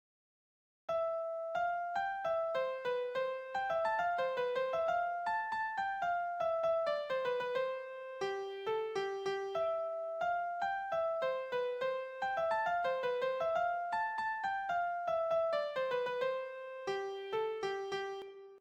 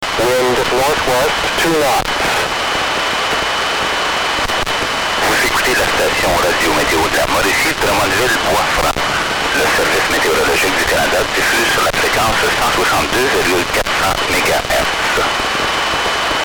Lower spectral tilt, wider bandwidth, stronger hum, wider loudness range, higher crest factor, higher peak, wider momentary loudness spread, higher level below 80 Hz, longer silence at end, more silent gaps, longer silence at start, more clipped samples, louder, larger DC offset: first, -4 dB/octave vs -2 dB/octave; second, 9 kHz vs over 20 kHz; neither; about the same, 2 LU vs 2 LU; about the same, 14 dB vs 14 dB; second, -22 dBFS vs -2 dBFS; first, 6 LU vs 3 LU; second, -76 dBFS vs -34 dBFS; about the same, 0 s vs 0 s; neither; first, 0.9 s vs 0 s; neither; second, -36 LUFS vs -13 LUFS; neither